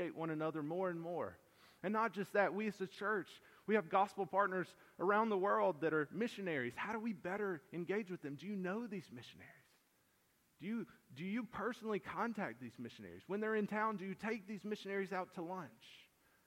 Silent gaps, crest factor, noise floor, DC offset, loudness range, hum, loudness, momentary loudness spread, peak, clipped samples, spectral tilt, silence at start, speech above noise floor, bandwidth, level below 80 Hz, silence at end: none; 20 dB; -76 dBFS; under 0.1%; 9 LU; none; -41 LUFS; 15 LU; -20 dBFS; under 0.1%; -6.5 dB/octave; 0 s; 36 dB; 16.5 kHz; -82 dBFS; 0.45 s